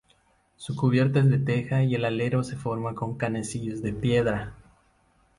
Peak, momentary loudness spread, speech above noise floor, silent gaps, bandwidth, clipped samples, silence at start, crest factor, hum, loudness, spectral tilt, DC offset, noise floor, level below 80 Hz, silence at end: -10 dBFS; 10 LU; 39 dB; none; 11.5 kHz; under 0.1%; 0.6 s; 16 dB; none; -26 LUFS; -7 dB/octave; under 0.1%; -64 dBFS; -52 dBFS; 0.85 s